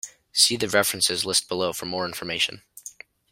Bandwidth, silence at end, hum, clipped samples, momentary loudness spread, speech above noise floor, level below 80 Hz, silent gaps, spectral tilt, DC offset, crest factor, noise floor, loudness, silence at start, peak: 16.5 kHz; 0.4 s; none; under 0.1%; 21 LU; 21 dB; -62 dBFS; none; -1.5 dB/octave; under 0.1%; 22 dB; -45 dBFS; -22 LUFS; 0.05 s; -4 dBFS